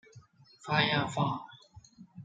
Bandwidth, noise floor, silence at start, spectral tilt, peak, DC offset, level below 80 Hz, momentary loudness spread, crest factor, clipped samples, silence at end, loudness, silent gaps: 9.4 kHz; -57 dBFS; 0.15 s; -5 dB/octave; -12 dBFS; under 0.1%; -68 dBFS; 21 LU; 22 dB; under 0.1%; 0 s; -30 LUFS; none